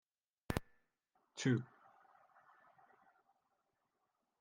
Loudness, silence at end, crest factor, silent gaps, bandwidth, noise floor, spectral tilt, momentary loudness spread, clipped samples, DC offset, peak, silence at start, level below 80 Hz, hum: -41 LUFS; 2.75 s; 28 dB; none; 9.4 kHz; -86 dBFS; -6 dB/octave; 18 LU; under 0.1%; under 0.1%; -20 dBFS; 0.5 s; -66 dBFS; none